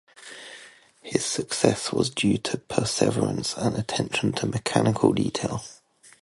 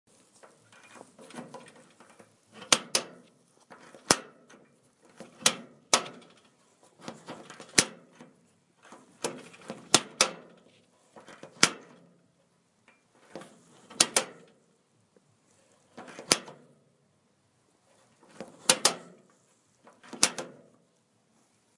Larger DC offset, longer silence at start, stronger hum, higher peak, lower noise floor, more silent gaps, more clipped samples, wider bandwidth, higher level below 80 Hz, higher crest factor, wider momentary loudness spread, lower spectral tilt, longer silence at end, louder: neither; second, 0.2 s vs 1.35 s; neither; about the same, -2 dBFS vs 0 dBFS; second, -50 dBFS vs -69 dBFS; neither; neither; about the same, 11.5 kHz vs 12 kHz; first, -54 dBFS vs -72 dBFS; second, 24 dB vs 34 dB; second, 18 LU vs 26 LU; first, -4.5 dB/octave vs -0.5 dB/octave; second, 0.45 s vs 1.3 s; about the same, -25 LUFS vs -26 LUFS